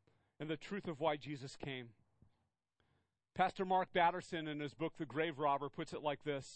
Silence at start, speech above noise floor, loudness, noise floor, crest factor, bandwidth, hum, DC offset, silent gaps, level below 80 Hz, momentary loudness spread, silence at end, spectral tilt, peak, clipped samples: 0.4 s; 43 dB; -40 LUFS; -83 dBFS; 22 dB; 8.4 kHz; none; under 0.1%; none; -74 dBFS; 12 LU; 0 s; -5.5 dB/octave; -18 dBFS; under 0.1%